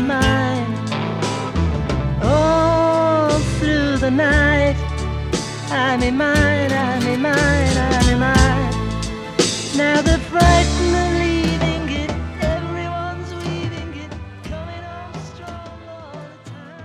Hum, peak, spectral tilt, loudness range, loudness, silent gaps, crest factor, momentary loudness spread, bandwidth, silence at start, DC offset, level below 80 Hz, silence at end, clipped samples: none; 0 dBFS; -5.5 dB/octave; 10 LU; -18 LUFS; none; 18 dB; 18 LU; 13.5 kHz; 0 s; under 0.1%; -26 dBFS; 0 s; under 0.1%